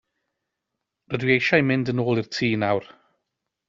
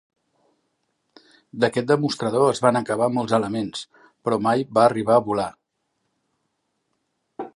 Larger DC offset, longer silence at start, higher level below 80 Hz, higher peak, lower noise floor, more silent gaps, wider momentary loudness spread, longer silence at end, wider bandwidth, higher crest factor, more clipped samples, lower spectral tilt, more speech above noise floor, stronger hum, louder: neither; second, 1.1 s vs 1.55 s; about the same, -60 dBFS vs -64 dBFS; about the same, -4 dBFS vs -2 dBFS; first, -82 dBFS vs -75 dBFS; neither; second, 8 LU vs 13 LU; first, 0.85 s vs 0.05 s; second, 7.6 kHz vs 11.5 kHz; about the same, 22 dB vs 20 dB; neither; about the same, -4.5 dB/octave vs -5.5 dB/octave; first, 60 dB vs 54 dB; neither; about the same, -22 LUFS vs -21 LUFS